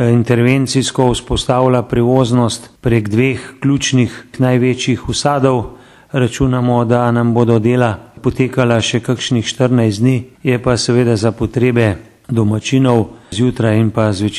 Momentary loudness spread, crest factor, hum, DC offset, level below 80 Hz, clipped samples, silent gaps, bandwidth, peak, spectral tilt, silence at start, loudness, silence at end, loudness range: 5 LU; 14 dB; none; under 0.1%; -36 dBFS; under 0.1%; none; 12.5 kHz; 0 dBFS; -6 dB/octave; 0 s; -14 LUFS; 0 s; 1 LU